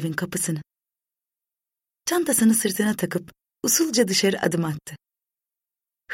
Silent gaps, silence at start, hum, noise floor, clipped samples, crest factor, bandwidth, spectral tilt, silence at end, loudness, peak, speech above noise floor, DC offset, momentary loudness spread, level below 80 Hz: none; 0 s; none; -90 dBFS; under 0.1%; 18 dB; 16.5 kHz; -3.5 dB/octave; 0 s; -22 LUFS; -6 dBFS; 67 dB; under 0.1%; 13 LU; -64 dBFS